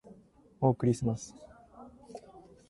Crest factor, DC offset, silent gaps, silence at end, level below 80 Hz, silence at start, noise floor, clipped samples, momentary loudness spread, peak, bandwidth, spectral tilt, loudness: 22 dB; under 0.1%; none; 0.3 s; -60 dBFS; 0.1 s; -58 dBFS; under 0.1%; 25 LU; -14 dBFS; 11.5 kHz; -8 dB/octave; -31 LUFS